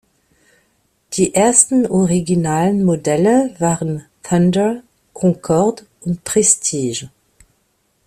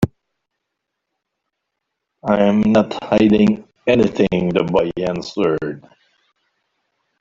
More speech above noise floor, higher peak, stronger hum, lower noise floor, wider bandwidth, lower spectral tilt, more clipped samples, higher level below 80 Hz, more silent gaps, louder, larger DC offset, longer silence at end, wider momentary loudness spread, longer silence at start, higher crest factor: second, 48 dB vs 62 dB; about the same, 0 dBFS vs 0 dBFS; neither; second, -63 dBFS vs -78 dBFS; first, 14.5 kHz vs 7.4 kHz; second, -5 dB/octave vs -7.5 dB/octave; neither; about the same, -50 dBFS vs -48 dBFS; neither; about the same, -15 LUFS vs -17 LUFS; neither; second, 1 s vs 1.4 s; first, 13 LU vs 10 LU; first, 1.1 s vs 0 s; about the same, 18 dB vs 18 dB